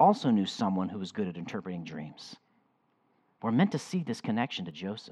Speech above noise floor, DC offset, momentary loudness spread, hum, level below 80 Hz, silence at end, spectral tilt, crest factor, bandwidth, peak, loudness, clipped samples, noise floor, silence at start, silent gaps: 41 dB; under 0.1%; 14 LU; none; -78 dBFS; 0 s; -6.5 dB/octave; 22 dB; 11.5 kHz; -10 dBFS; -31 LUFS; under 0.1%; -72 dBFS; 0 s; none